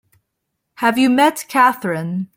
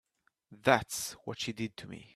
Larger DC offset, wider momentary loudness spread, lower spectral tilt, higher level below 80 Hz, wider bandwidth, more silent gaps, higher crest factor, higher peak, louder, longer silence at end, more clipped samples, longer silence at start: neither; second, 9 LU vs 12 LU; about the same, -4.5 dB/octave vs -3.5 dB/octave; about the same, -64 dBFS vs -66 dBFS; about the same, 16.5 kHz vs 15.5 kHz; neither; second, 16 dB vs 26 dB; first, -2 dBFS vs -8 dBFS; first, -16 LUFS vs -33 LUFS; about the same, 0.1 s vs 0.1 s; neither; first, 0.8 s vs 0.5 s